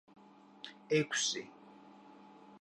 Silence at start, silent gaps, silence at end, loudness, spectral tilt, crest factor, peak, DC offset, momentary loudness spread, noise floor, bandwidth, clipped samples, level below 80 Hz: 0.65 s; none; 0.05 s; -34 LUFS; -2.5 dB/octave; 20 dB; -20 dBFS; under 0.1%; 25 LU; -58 dBFS; 11 kHz; under 0.1%; -88 dBFS